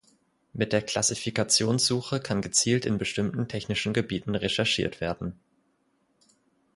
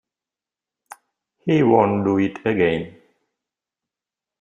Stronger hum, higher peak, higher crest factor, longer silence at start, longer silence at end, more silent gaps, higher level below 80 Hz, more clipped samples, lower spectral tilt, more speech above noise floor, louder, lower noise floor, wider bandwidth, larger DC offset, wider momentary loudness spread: neither; second, -8 dBFS vs -2 dBFS; about the same, 20 dB vs 20 dB; second, 0.55 s vs 1.45 s; about the same, 1.4 s vs 1.5 s; neither; about the same, -54 dBFS vs -58 dBFS; neither; second, -3.5 dB/octave vs -8 dB/octave; second, 43 dB vs 71 dB; second, -26 LUFS vs -19 LUFS; second, -70 dBFS vs -89 dBFS; about the same, 11.5 kHz vs 10.5 kHz; neither; second, 9 LU vs 13 LU